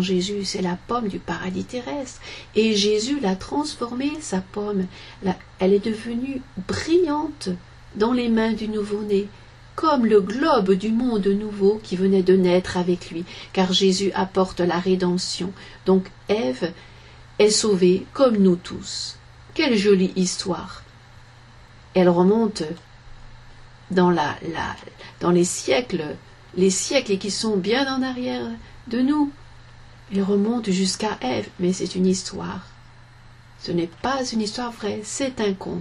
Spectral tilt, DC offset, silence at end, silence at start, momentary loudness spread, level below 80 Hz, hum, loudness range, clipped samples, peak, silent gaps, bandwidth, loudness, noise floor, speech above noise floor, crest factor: -5 dB/octave; under 0.1%; 0 s; 0 s; 13 LU; -48 dBFS; none; 4 LU; under 0.1%; -6 dBFS; none; 12 kHz; -22 LUFS; -47 dBFS; 25 dB; 18 dB